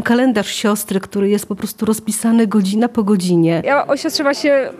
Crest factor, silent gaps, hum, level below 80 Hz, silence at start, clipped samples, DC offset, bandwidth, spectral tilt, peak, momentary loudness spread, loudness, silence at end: 12 dB; none; none; -56 dBFS; 0 s; under 0.1%; under 0.1%; 15 kHz; -5 dB/octave; -4 dBFS; 5 LU; -16 LUFS; 0 s